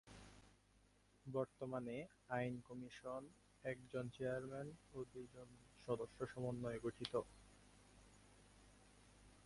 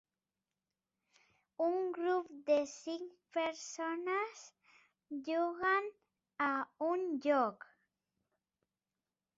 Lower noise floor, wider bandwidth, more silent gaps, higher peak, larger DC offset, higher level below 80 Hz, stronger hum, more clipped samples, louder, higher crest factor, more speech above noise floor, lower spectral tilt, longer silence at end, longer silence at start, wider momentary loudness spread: second, -74 dBFS vs under -90 dBFS; first, 11.5 kHz vs 7.6 kHz; neither; second, -26 dBFS vs -20 dBFS; neither; first, -72 dBFS vs -84 dBFS; neither; neither; second, -49 LUFS vs -37 LUFS; first, 24 dB vs 18 dB; second, 26 dB vs over 54 dB; first, -6.5 dB/octave vs -1.5 dB/octave; second, 0 s vs 1.8 s; second, 0.05 s vs 1.6 s; first, 22 LU vs 12 LU